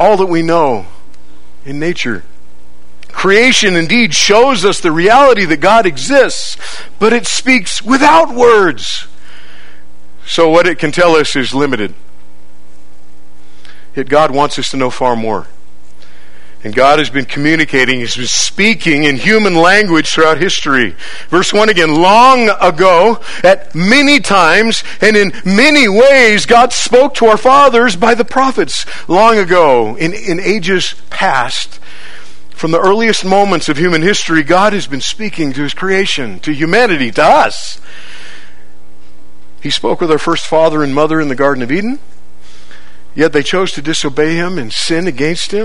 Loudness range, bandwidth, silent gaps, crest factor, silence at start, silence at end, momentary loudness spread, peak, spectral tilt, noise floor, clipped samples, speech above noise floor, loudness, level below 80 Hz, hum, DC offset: 8 LU; 12 kHz; none; 12 dB; 0 s; 0 s; 11 LU; 0 dBFS; -3.5 dB/octave; -45 dBFS; 0.9%; 35 dB; -10 LUFS; -42 dBFS; none; 10%